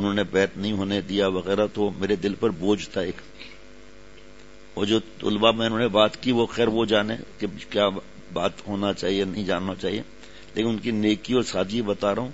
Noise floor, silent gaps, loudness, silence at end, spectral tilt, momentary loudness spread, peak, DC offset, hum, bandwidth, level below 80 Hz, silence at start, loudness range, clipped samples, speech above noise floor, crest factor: -48 dBFS; none; -24 LUFS; 0 s; -5.5 dB/octave; 12 LU; -2 dBFS; 0.6%; none; 8 kHz; -54 dBFS; 0 s; 5 LU; under 0.1%; 24 dB; 22 dB